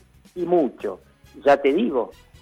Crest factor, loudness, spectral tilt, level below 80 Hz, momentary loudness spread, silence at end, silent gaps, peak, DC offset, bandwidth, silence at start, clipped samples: 14 dB; -22 LUFS; -6.5 dB/octave; -58 dBFS; 16 LU; 0.3 s; none; -8 dBFS; under 0.1%; 11.5 kHz; 0.35 s; under 0.1%